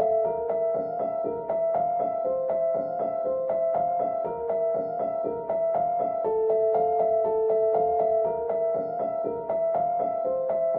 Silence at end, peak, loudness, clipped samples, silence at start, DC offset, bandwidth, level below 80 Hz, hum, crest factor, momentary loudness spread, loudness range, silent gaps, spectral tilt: 0 s; -14 dBFS; -26 LUFS; under 0.1%; 0 s; under 0.1%; 2.8 kHz; -62 dBFS; none; 12 dB; 5 LU; 3 LU; none; -10.5 dB/octave